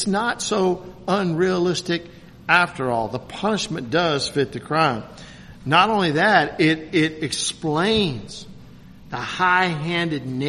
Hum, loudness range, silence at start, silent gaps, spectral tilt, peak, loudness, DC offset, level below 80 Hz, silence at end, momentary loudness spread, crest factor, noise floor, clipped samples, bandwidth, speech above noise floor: none; 3 LU; 0 s; none; -4.5 dB/octave; 0 dBFS; -21 LUFS; under 0.1%; -50 dBFS; 0 s; 14 LU; 22 dB; -43 dBFS; under 0.1%; 13 kHz; 22 dB